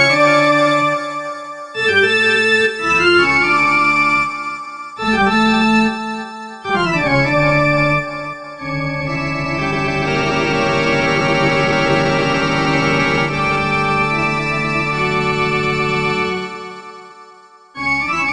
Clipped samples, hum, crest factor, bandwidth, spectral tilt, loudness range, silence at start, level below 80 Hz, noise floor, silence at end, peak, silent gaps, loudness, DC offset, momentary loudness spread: under 0.1%; none; 16 dB; 11 kHz; -5 dB/octave; 5 LU; 0 s; -42 dBFS; -43 dBFS; 0 s; 0 dBFS; none; -15 LUFS; 0.6%; 13 LU